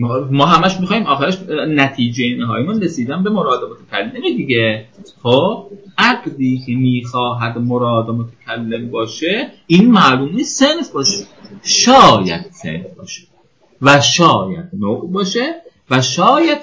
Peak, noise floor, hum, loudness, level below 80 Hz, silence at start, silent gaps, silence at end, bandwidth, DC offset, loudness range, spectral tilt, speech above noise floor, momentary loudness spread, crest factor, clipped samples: 0 dBFS; -53 dBFS; none; -14 LUFS; -50 dBFS; 0 s; none; 0 s; 8 kHz; 0.2%; 6 LU; -4.5 dB/octave; 39 dB; 15 LU; 14 dB; 0.2%